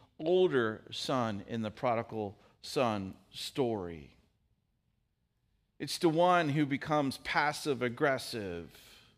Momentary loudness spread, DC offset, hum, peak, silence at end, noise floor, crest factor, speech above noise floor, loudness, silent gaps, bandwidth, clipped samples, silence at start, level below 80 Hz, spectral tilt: 15 LU; under 0.1%; none; -14 dBFS; 0.5 s; -78 dBFS; 20 dB; 46 dB; -32 LUFS; none; 15.5 kHz; under 0.1%; 0.2 s; -68 dBFS; -5.5 dB/octave